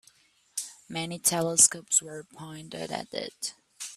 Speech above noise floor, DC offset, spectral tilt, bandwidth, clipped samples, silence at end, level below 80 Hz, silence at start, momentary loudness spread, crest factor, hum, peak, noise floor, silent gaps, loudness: 34 dB; under 0.1%; -1.5 dB/octave; 15.5 kHz; under 0.1%; 0 s; -72 dBFS; 0.55 s; 22 LU; 26 dB; none; -4 dBFS; -62 dBFS; none; -26 LUFS